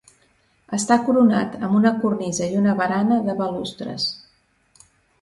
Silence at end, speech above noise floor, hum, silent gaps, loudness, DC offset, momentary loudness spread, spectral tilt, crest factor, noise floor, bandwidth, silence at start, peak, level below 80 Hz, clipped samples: 1.05 s; 42 dB; none; none; -20 LUFS; under 0.1%; 10 LU; -5 dB/octave; 18 dB; -61 dBFS; 11.5 kHz; 0.7 s; -4 dBFS; -60 dBFS; under 0.1%